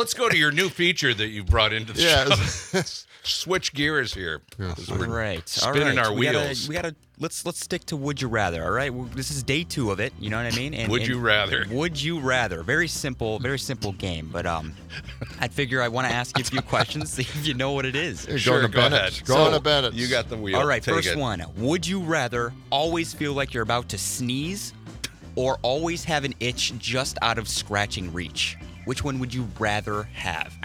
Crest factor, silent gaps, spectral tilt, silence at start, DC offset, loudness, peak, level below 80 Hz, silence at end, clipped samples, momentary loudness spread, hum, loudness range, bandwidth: 22 dB; none; -4 dB/octave; 0 s; under 0.1%; -24 LUFS; -4 dBFS; -44 dBFS; 0 s; under 0.1%; 11 LU; none; 6 LU; 18 kHz